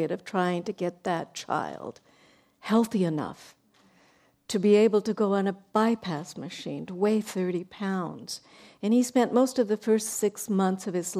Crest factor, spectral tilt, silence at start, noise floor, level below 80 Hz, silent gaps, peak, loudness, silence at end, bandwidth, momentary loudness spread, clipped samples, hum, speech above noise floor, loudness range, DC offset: 18 dB; -5.5 dB/octave; 0 s; -63 dBFS; -72 dBFS; none; -10 dBFS; -27 LUFS; 0 s; 15.5 kHz; 14 LU; under 0.1%; none; 36 dB; 5 LU; under 0.1%